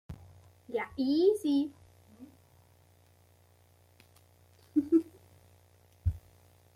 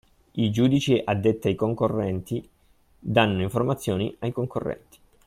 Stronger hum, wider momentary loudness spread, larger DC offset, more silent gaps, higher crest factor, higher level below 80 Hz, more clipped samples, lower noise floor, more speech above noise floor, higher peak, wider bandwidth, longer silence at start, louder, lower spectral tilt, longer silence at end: neither; first, 24 LU vs 12 LU; neither; neither; about the same, 20 dB vs 20 dB; about the same, -54 dBFS vs -54 dBFS; neither; first, -63 dBFS vs -59 dBFS; about the same, 35 dB vs 35 dB; second, -16 dBFS vs -6 dBFS; about the same, 15.5 kHz vs 16 kHz; second, 0.1 s vs 0.35 s; second, -31 LUFS vs -25 LUFS; about the same, -7.5 dB/octave vs -6.5 dB/octave; about the same, 0.55 s vs 0.5 s